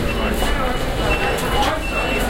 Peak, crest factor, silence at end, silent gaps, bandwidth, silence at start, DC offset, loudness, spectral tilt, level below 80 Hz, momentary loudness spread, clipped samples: -4 dBFS; 14 dB; 0 s; none; 16 kHz; 0 s; under 0.1%; -20 LUFS; -4.5 dB/octave; -24 dBFS; 3 LU; under 0.1%